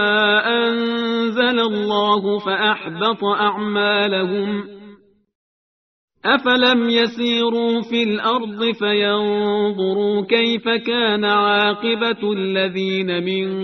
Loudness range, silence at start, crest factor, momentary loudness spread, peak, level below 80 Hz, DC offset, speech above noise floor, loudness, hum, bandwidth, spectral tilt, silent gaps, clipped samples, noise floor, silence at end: 3 LU; 0 s; 16 dB; 6 LU; -2 dBFS; -64 dBFS; under 0.1%; 27 dB; -18 LUFS; none; 6.4 kHz; -2 dB/octave; 5.35-6.08 s; under 0.1%; -46 dBFS; 0 s